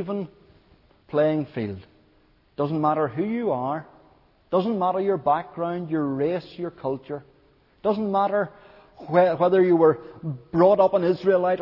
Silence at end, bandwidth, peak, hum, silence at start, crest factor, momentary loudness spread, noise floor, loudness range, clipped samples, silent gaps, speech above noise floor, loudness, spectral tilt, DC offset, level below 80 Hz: 0 s; 5.8 kHz; -6 dBFS; none; 0 s; 18 dB; 15 LU; -60 dBFS; 6 LU; under 0.1%; none; 37 dB; -23 LUFS; -10 dB/octave; under 0.1%; -62 dBFS